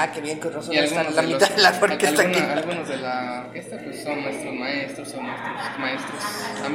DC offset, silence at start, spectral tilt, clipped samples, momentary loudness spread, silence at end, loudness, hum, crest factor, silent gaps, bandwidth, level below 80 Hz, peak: under 0.1%; 0 s; -3 dB/octave; under 0.1%; 14 LU; 0 s; -23 LUFS; none; 22 dB; none; 16 kHz; -70 dBFS; -2 dBFS